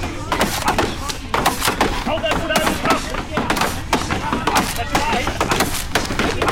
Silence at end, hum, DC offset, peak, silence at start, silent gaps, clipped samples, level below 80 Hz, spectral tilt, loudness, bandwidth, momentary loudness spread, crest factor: 0 s; none; under 0.1%; -6 dBFS; 0 s; none; under 0.1%; -30 dBFS; -3.5 dB/octave; -19 LUFS; 17 kHz; 4 LU; 14 dB